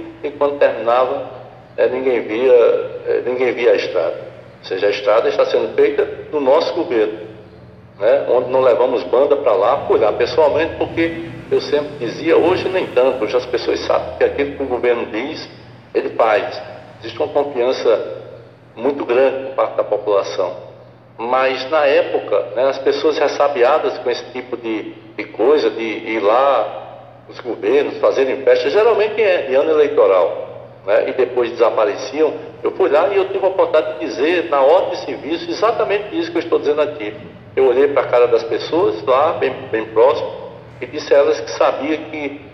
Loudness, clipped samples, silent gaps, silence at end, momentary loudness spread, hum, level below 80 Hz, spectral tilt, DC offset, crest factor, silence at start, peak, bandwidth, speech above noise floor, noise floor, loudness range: -16 LUFS; under 0.1%; none; 0 s; 13 LU; none; -54 dBFS; -5.5 dB/octave; under 0.1%; 16 dB; 0 s; -2 dBFS; 6.2 kHz; 25 dB; -41 dBFS; 4 LU